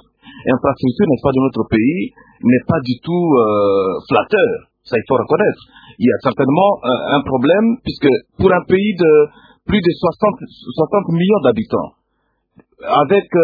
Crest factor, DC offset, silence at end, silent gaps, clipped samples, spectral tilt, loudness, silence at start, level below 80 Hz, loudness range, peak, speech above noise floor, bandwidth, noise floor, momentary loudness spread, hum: 16 dB; under 0.1%; 0 s; none; under 0.1%; -10 dB/octave; -15 LUFS; 0.25 s; -46 dBFS; 3 LU; 0 dBFS; 52 dB; 5 kHz; -67 dBFS; 8 LU; none